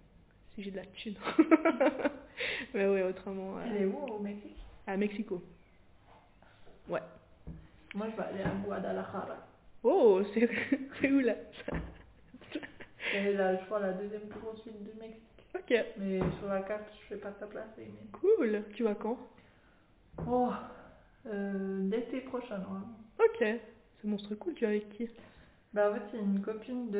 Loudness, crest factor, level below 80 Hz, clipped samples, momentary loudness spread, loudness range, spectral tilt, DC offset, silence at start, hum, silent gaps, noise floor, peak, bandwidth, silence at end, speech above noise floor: -34 LUFS; 24 dB; -60 dBFS; under 0.1%; 18 LU; 9 LU; -5.5 dB/octave; under 0.1%; 0.5 s; none; none; -64 dBFS; -10 dBFS; 4 kHz; 0 s; 30 dB